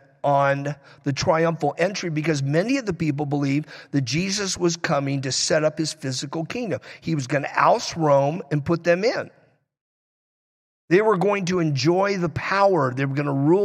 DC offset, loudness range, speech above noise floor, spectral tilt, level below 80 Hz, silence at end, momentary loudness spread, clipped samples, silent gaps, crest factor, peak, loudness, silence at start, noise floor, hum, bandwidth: under 0.1%; 2 LU; over 68 dB; -5 dB/octave; -58 dBFS; 0 s; 9 LU; under 0.1%; 9.81-10.88 s; 18 dB; -4 dBFS; -22 LUFS; 0.25 s; under -90 dBFS; none; 12 kHz